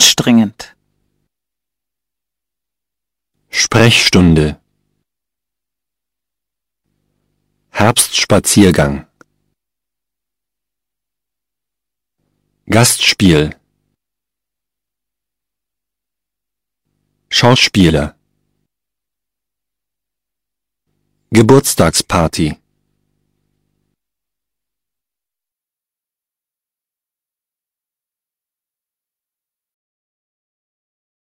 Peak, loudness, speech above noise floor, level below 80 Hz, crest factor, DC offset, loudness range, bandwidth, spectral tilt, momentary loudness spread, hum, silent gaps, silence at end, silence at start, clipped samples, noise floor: 0 dBFS; -11 LUFS; 78 dB; -38 dBFS; 18 dB; under 0.1%; 9 LU; 16.5 kHz; -4 dB/octave; 11 LU; none; none; 8.75 s; 0 s; 0.1%; -88 dBFS